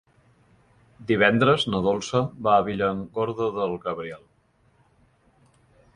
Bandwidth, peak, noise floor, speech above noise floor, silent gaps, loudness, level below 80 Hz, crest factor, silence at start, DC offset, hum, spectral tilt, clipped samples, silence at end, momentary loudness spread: 11.5 kHz; -4 dBFS; -63 dBFS; 40 dB; none; -23 LUFS; -56 dBFS; 22 dB; 1 s; under 0.1%; none; -5.5 dB/octave; under 0.1%; 1.8 s; 14 LU